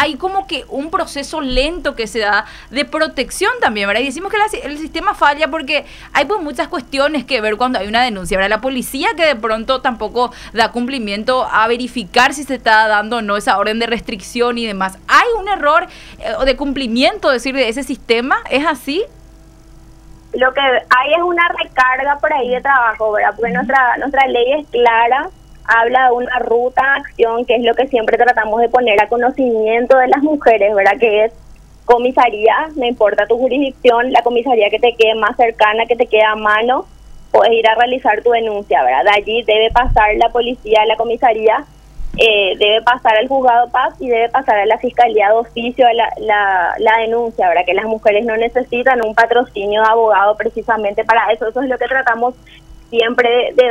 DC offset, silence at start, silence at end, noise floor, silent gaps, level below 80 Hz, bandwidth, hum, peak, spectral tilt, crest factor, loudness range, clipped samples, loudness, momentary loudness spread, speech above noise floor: under 0.1%; 0 s; 0 s; -40 dBFS; none; -36 dBFS; 15 kHz; none; 0 dBFS; -3.5 dB/octave; 14 dB; 4 LU; under 0.1%; -14 LUFS; 7 LU; 27 dB